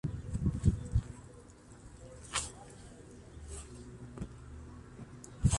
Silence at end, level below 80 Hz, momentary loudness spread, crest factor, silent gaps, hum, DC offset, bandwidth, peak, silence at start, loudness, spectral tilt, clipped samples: 0 s; -44 dBFS; 21 LU; 24 dB; none; none; under 0.1%; 11.5 kHz; -14 dBFS; 0.05 s; -38 LUFS; -5 dB/octave; under 0.1%